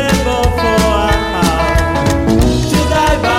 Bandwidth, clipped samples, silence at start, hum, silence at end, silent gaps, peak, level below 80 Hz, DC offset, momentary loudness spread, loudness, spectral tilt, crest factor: 16.5 kHz; under 0.1%; 0 s; none; 0 s; none; -2 dBFS; -20 dBFS; under 0.1%; 2 LU; -13 LUFS; -5 dB/octave; 10 dB